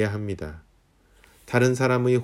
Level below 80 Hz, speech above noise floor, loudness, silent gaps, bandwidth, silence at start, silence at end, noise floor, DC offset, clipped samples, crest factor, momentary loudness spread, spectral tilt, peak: -52 dBFS; 37 dB; -24 LUFS; none; 14.5 kHz; 0 s; 0 s; -60 dBFS; under 0.1%; under 0.1%; 18 dB; 14 LU; -6.5 dB/octave; -8 dBFS